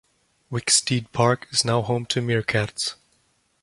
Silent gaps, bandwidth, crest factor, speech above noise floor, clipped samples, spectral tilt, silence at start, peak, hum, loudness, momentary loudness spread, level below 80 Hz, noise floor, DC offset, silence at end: none; 11.5 kHz; 20 dB; 43 dB; under 0.1%; -3.5 dB/octave; 0.5 s; -4 dBFS; none; -22 LUFS; 9 LU; -56 dBFS; -66 dBFS; under 0.1%; 0.7 s